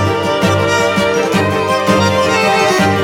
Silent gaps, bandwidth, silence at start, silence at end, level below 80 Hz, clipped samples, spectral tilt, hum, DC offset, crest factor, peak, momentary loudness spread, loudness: none; 17.5 kHz; 0 s; 0 s; -46 dBFS; under 0.1%; -4.5 dB/octave; none; under 0.1%; 12 dB; 0 dBFS; 3 LU; -12 LUFS